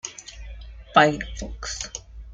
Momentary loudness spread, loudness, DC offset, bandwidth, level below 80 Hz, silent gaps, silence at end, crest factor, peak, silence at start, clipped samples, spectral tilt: 23 LU; -23 LUFS; under 0.1%; 9.6 kHz; -40 dBFS; none; 0 s; 24 dB; 0 dBFS; 0.05 s; under 0.1%; -3.5 dB/octave